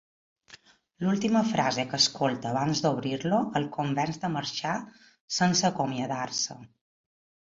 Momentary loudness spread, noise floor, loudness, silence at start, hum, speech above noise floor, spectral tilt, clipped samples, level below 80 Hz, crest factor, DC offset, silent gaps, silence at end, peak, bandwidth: 9 LU; -55 dBFS; -28 LUFS; 0.5 s; none; 28 dB; -4 dB/octave; under 0.1%; -66 dBFS; 20 dB; under 0.1%; 5.20-5.28 s; 0.9 s; -8 dBFS; 8 kHz